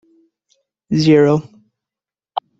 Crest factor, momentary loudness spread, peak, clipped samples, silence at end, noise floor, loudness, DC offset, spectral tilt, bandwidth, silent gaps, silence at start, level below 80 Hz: 18 dB; 16 LU; 0 dBFS; under 0.1%; 0.2 s; -89 dBFS; -14 LUFS; under 0.1%; -7 dB/octave; 7.8 kHz; none; 0.9 s; -56 dBFS